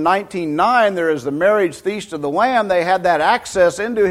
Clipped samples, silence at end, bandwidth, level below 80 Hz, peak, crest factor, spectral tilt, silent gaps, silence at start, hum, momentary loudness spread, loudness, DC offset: under 0.1%; 0 s; 14 kHz; -52 dBFS; -2 dBFS; 14 dB; -4.5 dB/octave; none; 0 s; none; 7 LU; -17 LUFS; under 0.1%